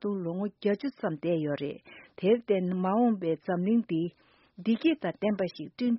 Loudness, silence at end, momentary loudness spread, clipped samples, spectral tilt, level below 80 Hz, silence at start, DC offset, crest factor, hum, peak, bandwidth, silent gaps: -30 LUFS; 0 s; 9 LU; under 0.1%; -6.5 dB/octave; -72 dBFS; 0 s; under 0.1%; 16 dB; none; -14 dBFS; 5.8 kHz; none